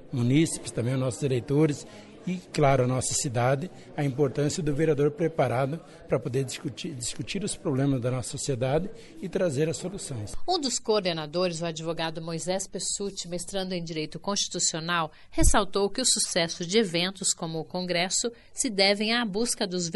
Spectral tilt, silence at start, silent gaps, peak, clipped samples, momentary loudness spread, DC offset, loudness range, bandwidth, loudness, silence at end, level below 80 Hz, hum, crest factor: -4 dB/octave; 0 s; none; -8 dBFS; under 0.1%; 10 LU; under 0.1%; 4 LU; 11.5 kHz; -27 LUFS; 0 s; -40 dBFS; none; 20 dB